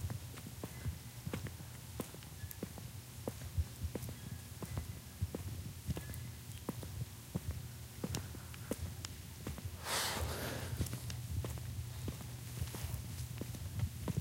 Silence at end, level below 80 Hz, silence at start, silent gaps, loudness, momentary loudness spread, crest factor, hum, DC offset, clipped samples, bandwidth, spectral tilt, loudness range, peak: 0 s; -52 dBFS; 0 s; none; -44 LUFS; 7 LU; 24 dB; none; under 0.1%; under 0.1%; 17 kHz; -4.5 dB/octave; 4 LU; -20 dBFS